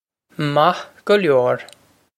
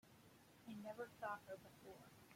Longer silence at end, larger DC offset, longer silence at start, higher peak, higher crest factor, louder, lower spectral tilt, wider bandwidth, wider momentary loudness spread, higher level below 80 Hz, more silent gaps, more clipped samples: first, 0.5 s vs 0 s; neither; first, 0.4 s vs 0.05 s; first, -2 dBFS vs -36 dBFS; about the same, 18 dB vs 20 dB; first, -18 LUFS vs -55 LUFS; about the same, -6 dB/octave vs -5 dB/octave; second, 13.5 kHz vs 16.5 kHz; second, 11 LU vs 17 LU; first, -66 dBFS vs -84 dBFS; neither; neither